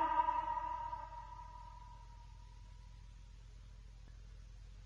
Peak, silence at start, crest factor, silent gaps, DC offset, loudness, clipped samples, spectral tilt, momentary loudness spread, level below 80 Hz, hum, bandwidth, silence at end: -22 dBFS; 0 s; 22 dB; none; under 0.1%; -41 LUFS; under 0.1%; -5.5 dB/octave; 21 LU; -56 dBFS; none; 7.6 kHz; 0 s